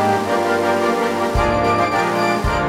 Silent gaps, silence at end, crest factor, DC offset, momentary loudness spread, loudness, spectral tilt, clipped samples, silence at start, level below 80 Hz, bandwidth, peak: none; 0 s; 12 dB; under 0.1%; 2 LU; -17 LUFS; -5.5 dB/octave; under 0.1%; 0 s; -32 dBFS; 16.5 kHz; -6 dBFS